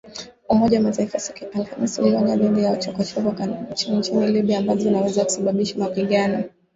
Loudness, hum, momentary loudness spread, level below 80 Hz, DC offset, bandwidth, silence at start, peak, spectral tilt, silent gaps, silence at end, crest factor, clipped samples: -21 LUFS; none; 9 LU; -56 dBFS; under 0.1%; 8 kHz; 0.05 s; -4 dBFS; -5.5 dB/octave; none; 0.25 s; 16 dB; under 0.1%